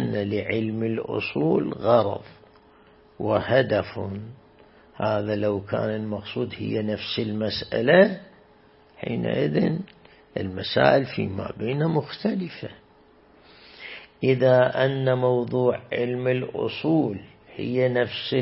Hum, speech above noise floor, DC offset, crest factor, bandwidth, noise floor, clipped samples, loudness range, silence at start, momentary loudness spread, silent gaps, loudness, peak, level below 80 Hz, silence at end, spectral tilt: none; 32 dB; under 0.1%; 22 dB; 5.8 kHz; -55 dBFS; under 0.1%; 5 LU; 0 s; 15 LU; none; -24 LUFS; -2 dBFS; -58 dBFS; 0 s; -11 dB/octave